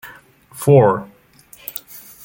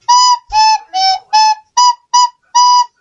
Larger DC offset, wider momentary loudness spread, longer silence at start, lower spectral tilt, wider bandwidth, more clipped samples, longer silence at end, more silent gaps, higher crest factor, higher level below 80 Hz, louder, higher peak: neither; first, 21 LU vs 4 LU; about the same, 0.05 s vs 0.1 s; first, -7.5 dB/octave vs 4 dB/octave; first, 17 kHz vs 7.8 kHz; neither; about the same, 0.25 s vs 0.15 s; neither; first, 18 dB vs 10 dB; second, -56 dBFS vs -48 dBFS; second, -15 LUFS vs -10 LUFS; about the same, -2 dBFS vs 0 dBFS